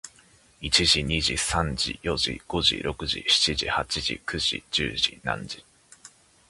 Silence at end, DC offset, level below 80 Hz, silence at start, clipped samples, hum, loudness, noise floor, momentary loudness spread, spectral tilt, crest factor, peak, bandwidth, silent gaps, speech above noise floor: 0.4 s; under 0.1%; -42 dBFS; 0.05 s; under 0.1%; none; -24 LUFS; -57 dBFS; 10 LU; -2.5 dB/octave; 22 dB; -4 dBFS; 11.5 kHz; none; 31 dB